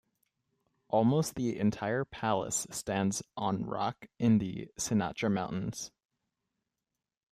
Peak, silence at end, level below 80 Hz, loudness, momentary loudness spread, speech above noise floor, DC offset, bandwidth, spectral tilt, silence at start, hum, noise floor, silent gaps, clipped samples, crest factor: -14 dBFS; 1.45 s; -64 dBFS; -32 LUFS; 9 LU; 58 dB; under 0.1%; 15.5 kHz; -5.5 dB/octave; 0.9 s; none; -89 dBFS; none; under 0.1%; 18 dB